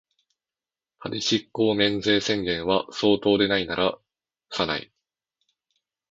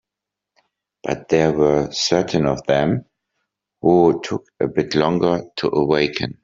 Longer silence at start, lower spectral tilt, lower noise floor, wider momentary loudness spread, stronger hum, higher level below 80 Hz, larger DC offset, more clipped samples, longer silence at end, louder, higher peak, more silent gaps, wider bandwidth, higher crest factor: about the same, 1 s vs 1.05 s; about the same, -4.5 dB/octave vs -5 dB/octave; first, under -90 dBFS vs -85 dBFS; about the same, 11 LU vs 9 LU; neither; second, -56 dBFS vs -50 dBFS; neither; neither; first, 1.3 s vs 0.1 s; second, -23 LUFS vs -19 LUFS; second, -4 dBFS vs 0 dBFS; neither; about the same, 7.8 kHz vs 7.8 kHz; about the same, 22 dB vs 18 dB